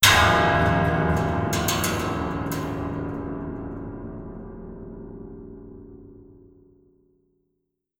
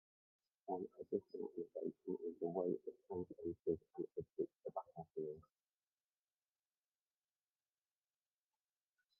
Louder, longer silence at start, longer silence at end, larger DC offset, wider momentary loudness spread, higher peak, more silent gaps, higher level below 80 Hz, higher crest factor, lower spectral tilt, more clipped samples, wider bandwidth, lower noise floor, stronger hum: first, -23 LUFS vs -47 LUFS; second, 0 s vs 0.65 s; second, 1.65 s vs 3.8 s; neither; first, 22 LU vs 7 LU; first, -2 dBFS vs -26 dBFS; neither; first, -42 dBFS vs -84 dBFS; about the same, 24 dB vs 22 dB; second, -4 dB/octave vs -11.5 dB/octave; neither; first, 20 kHz vs 5 kHz; second, -77 dBFS vs under -90 dBFS; neither